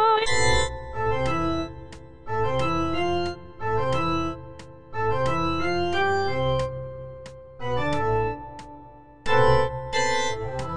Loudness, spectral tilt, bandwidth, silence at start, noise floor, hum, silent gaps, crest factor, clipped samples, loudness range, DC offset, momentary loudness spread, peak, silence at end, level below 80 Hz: -25 LUFS; -5 dB/octave; 10.5 kHz; 0 s; -47 dBFS; none; none; 18 dB; under 0.1%; 2 LU; 2%; 19 LU; -6 dBFS; 0 s; -40 dBFS